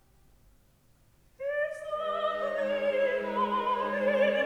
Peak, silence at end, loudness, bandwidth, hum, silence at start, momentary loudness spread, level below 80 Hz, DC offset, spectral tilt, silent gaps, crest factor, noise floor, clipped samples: -16 dBFS; 0 s; -30 LUFS; 10.5 kHz; none; 1.4 s; 7 LU; -66 dBFS; under 0.1%; -5.5 dB/octave; none; 16 dB; -63 dBFS; under 0.1%